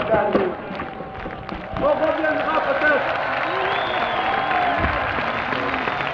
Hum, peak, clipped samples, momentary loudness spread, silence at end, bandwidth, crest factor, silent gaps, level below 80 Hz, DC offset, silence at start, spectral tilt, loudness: none; -8 dBFS; under 0.1%; 12 LU; 0 s; 7.4 kHz; 14 dB; none; -42 dBFS; under 0.1%; 0 s; -6.5 dB/octave; -21 LUFS